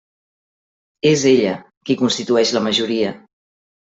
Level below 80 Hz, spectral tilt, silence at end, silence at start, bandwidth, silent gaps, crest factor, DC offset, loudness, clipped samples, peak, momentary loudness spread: -60 dBFS; -4.5 dB/octave; 0.65 s; 1.05 s; 8 kHz; 1.77-1.81 s; 16 dB; under 0.1%; -17 LUFS; under 0.1%; -4 dBFS; 9 LU